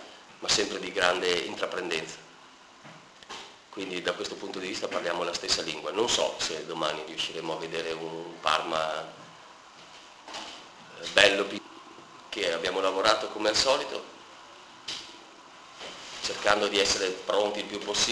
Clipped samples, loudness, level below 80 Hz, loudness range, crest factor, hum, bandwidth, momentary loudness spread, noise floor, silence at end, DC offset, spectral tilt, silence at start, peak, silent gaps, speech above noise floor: under 0.1%; -28 LUFS; -62 dBFS; 7 LU; 28 dB; none; 11 kHz; 24 LU; -53 dBFS; 0 s; under 0.1%; -1.5 dB/octave; 0 s; -2 dBFS; none; 24 dB